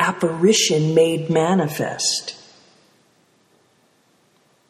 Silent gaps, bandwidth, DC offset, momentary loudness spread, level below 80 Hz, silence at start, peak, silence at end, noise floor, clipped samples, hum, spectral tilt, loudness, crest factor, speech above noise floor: none; 15 kHz; under 0.1%; 8 LU; -66 dBFS; 0 s; -4 dBFS; 2.35 s; -60 dBFS; under 0.1%; none; -4 dB/octave; -18 LUFS; 18 dB; 42 dB